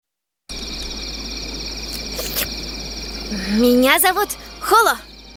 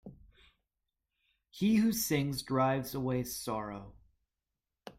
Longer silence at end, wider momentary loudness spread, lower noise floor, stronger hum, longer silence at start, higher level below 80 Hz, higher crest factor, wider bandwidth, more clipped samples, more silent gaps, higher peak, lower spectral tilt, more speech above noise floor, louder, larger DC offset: about the same, 0 s vs 0.05 s; first, 14 LU vs 10 LU; second, -40 dBFS vs -89 dBFS; neither; first, 0.5 s vs 0.05 s; first, -36 dBFS vs -62 dBFS; about the same, 20 dB vs 18 dB; first, over 20 kHz vs 16.5 kHz; neither; neither; first, 0 dBFS vs -18 dBFS; second, -3 dB/octave vs -5 dB/octave; second, 24 dB vs 57 dB; first, -19 LUFS vs -32 LUFS; neither